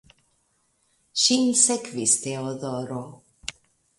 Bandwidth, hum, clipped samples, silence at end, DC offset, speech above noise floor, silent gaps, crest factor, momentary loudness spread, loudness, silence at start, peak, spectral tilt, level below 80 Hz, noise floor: 11.5 kHz; none; under 0.1%; 0.5 s; under 0.1%; 45 dB; none; 22 dB; 19 LU; -22 LUFS; 1.15 s; -4 dBFS; -2.5 dB/octave; -66 dBFS; -69 dBFS